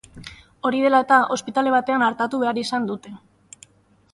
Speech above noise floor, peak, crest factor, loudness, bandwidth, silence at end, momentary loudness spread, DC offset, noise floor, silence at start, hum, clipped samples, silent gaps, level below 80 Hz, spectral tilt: 32 dB; -4 dBFS; 18 dB; -20 LUFS; 11.5 kHz; 1 s; 18 LU; under 0.1%; -52 dBFS; 0.15 s; none; under 0.1%; none; -60 dBFS; -4 dB/octave